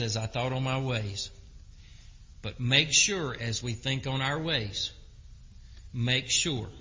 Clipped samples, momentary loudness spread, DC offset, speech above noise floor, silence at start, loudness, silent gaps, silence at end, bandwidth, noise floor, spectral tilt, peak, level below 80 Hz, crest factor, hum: under 0.1%; 13 LU; under 0.1%; 20 dB; 0 s; -28 LUFS; none; 0 s; 7.8 kHz; -50 dBFS; -3 dB/octave; -8 dBFS; -50 dBFS; 24 dB; none